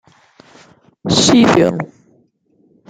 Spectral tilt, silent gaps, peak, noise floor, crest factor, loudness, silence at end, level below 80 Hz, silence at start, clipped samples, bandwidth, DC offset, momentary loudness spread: -4.5 dB/octave; none; -2 dBFS; -57 dBFS; 16 dB; -12 LUFS; 1.05 s; -50 dBFS; 1.05 s; under 0.1%; 9.6 kHz; under 0.1%; 19 LU